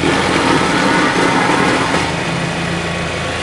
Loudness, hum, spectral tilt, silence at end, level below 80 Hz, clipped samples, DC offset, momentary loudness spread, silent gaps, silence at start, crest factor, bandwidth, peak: -14 LUFS; none; -4.5 dB/octave; 0 s; -40 dBFS; under 0.1%; under 0.1%; 6 LU; none; 0 s; 14 dB; 11.5 kHz; -2 dBFS